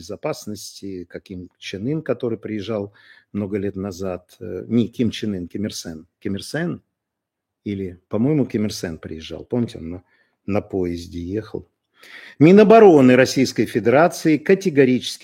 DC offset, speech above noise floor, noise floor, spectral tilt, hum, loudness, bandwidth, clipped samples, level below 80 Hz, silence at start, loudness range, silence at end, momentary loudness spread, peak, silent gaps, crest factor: under 0.1%; 62 dB; -82 dBFS; -6 dB/octave; none; -19 LUFS; 16 kHz; under 0.1%; -54 dBFS; 0 s; 13 LU; 0.1 s; 21 LU; 0 dBFS; none; 20 dB